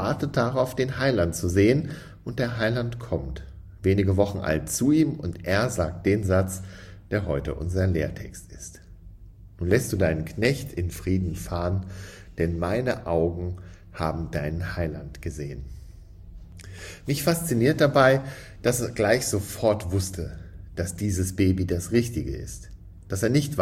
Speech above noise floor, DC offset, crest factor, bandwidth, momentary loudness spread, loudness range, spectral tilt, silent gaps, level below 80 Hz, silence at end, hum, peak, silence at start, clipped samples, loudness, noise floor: 21 dB; under 0.1%; 20 dB; 16 kHz; 18 LU; 7 LU; -6 dB/octave; none; -44 dBFS; 0 s; none; -6 dBFS; 0 s; under 0.1%; -25 LUFS; -46 dBFS